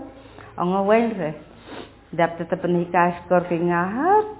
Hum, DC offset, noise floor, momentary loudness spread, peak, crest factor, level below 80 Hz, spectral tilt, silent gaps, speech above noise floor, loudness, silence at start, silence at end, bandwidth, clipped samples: none; under 0.1%; -43 dBFS; 20 LU; -4 dBFS; 18 dB; -54 dBFS; -11 dB/octave; none; 22 dB; -22 LUFS; 0 s; 0 s; 4 kHz; under 0.1%